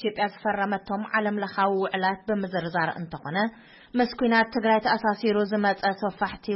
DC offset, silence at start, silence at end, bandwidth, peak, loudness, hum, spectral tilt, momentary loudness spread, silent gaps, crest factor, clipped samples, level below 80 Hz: under 0.1%; 0 s; 0 s; 5.8 kHz; -10 dBFS; -26 LUFS; none; -9.5 dB/octave; 7 LU; none; 16 dB; under 0.1%; -60 dBFS